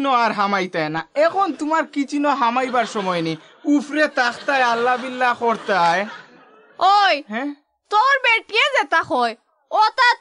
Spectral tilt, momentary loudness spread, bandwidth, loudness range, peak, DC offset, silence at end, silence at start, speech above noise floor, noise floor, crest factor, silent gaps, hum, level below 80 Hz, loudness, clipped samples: -4 dB/octave; 9 LU; 11 kHz; 2 LU; -4 dBFS; under 0.1%; 0.05 s; 0 s; 30 dB; -49 dBFS; 14 dB; none; none; -72 dBFS; -19 LUFS; under 0.1%